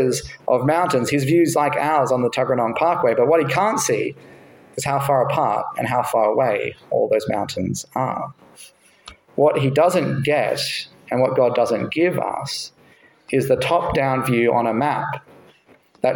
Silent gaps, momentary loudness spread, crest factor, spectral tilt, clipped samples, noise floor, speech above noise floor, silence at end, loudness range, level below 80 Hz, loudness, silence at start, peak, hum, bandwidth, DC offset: none; 9 LU; 16 dB; -5 dB/octave; under 0.1%; -54 dBFS; 35 dB; 0 s; 4 LU; -52 dBFS; -20 LUFS; 0 s; -4 dBFS; none; 17 kHz; under 0.1%